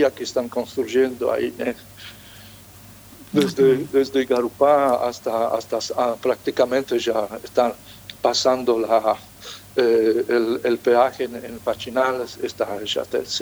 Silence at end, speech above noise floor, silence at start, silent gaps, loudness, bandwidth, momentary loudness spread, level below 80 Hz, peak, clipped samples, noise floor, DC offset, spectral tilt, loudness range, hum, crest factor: 0 s; 24 dB; 0 s; none; -21 LUFS; over 20 kHz; 11 LU; -58 dBFS; -4 dBFS; under 0.1%; -44 dBFS; under 0.1%; -4.5 dB/octave; 3 LU; none; 18 dB